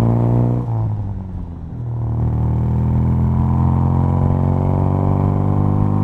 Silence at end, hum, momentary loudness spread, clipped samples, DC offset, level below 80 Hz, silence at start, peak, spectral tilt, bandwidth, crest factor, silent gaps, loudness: 0 s; none; 10 LU; under 0.1%; under 0.1%; -28 dBFS; 0 s; -4 dBFS; -11.5 dB/octave; 3.3 kHz; 12 dB; none; -18 LUFS